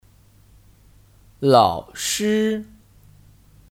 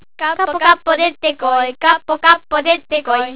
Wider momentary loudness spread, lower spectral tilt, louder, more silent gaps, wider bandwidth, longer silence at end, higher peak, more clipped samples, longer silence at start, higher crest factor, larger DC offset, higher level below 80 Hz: first, 10 LU vs 5 LU; about the same, -4.5 dB/octave vs -5.5 dB/octave; second, -20 LUFS vs -14 LUFS; neither; first, 17.5 kHz vs 4 kHz; first, 1.1 s vs 0 s; about the same, -2 dBFS vs 0 dBFS; second, under 0.1% vs 0.1%; first, 1.4 s vs 0.2 s; first, 22 dB vs 16 dB; second, under 0.1% vs 1%; about the same, -54 dBFS vs -52 dBFS